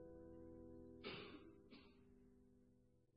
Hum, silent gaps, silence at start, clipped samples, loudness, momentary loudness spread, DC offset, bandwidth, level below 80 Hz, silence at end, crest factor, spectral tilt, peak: none; none; 0 s; under 0.1%; -59 LUFS; 12 LU; under 0.1%; 5 kHz; -74 dBFS; 0 s; 20 dB; -3.5 dB/octave; -40 dBFS